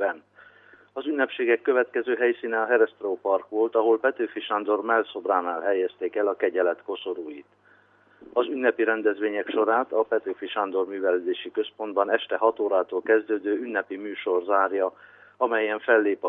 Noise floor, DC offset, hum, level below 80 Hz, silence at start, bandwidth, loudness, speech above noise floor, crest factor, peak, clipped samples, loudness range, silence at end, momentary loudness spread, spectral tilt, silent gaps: -58 dBFS; under 0.1%; 50 Hz at -70 dBFS; -82 dBFS; 0 s; 3.8 kHz; -25 LUFS; 34 dB; 18 dB; -6 dBFS; under 0.1%; 3 LU; 0 s; 8 LU; -7 dB/octave; none